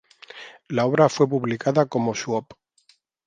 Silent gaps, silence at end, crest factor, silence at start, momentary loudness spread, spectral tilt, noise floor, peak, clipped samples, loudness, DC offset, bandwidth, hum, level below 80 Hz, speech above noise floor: none; 0.85 s; 20 dB; 0.35 s; 22 LU; -6 dB/octave; -62 dBFS; -2 dBFS; under 0.1%; -22 LUFS; under 0.1%; 9.4 kHz; none; -66 dBFS; 40 dB